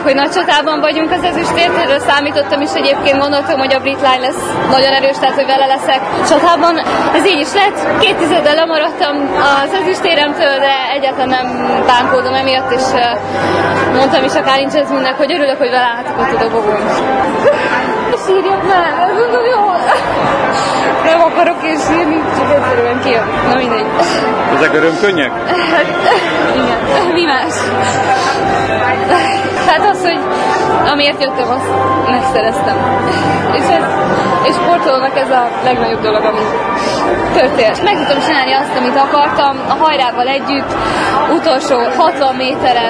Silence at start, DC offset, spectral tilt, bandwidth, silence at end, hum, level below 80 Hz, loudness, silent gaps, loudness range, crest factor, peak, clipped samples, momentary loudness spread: 0 s; under 0.1%; -4 dB/octave; 11 kHz; 0 s; none; -42 dBFS; -11 LUFS; none; 1 LU; 12 dB; 0 dBFS; under 0.1%; 3 LU